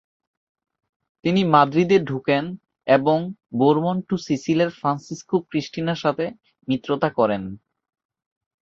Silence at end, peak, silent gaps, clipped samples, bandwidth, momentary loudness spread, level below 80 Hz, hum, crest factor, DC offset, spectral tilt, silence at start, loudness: 1.05 s; -2 dBFS; none; under 0.1%; 7.6 kHz; 12 LU; -60 dBFS; none; 20 dB; under 0.1%; -6.5 dB/octave; 1.25 s; -21 LUFS